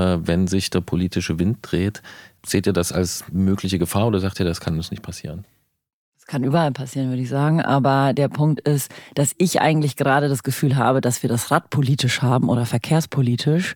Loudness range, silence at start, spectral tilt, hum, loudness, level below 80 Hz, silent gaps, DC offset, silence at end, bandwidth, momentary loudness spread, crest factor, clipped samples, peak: 5 LU; 0 s; -5.5 dB/octave; none; -20 LUFS; -46 dBFS; 5.93-6.12 s; under 0.1%; 0 s; 18.5 kHz; 8 LU; 18 dB; under 0.1%; -2 dBFS